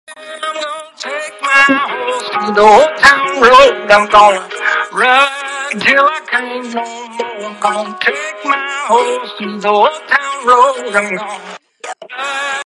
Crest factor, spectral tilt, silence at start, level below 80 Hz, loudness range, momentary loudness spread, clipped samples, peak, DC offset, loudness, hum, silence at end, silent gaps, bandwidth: 12 dB; -2.5 dB/octave; 0.1 s; -50 dBFS; 7 LU; 16 LU; 0.3%; 0 dBFS; under 0.1%; -11 LUFS; none; 0.05 s; none; 12.5 kHz